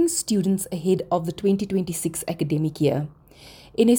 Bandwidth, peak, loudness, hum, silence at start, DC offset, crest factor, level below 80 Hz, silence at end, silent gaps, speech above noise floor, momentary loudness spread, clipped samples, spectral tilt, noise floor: over 20 kHz; -6 dBFS; -24 LUFS; none; 0 s; under 0.1%; 16 dB; -56 dBFS; 0 s; none; 24 dB; 5 LU; under 0.1%; -5.5 dB/octave; -47 dBFS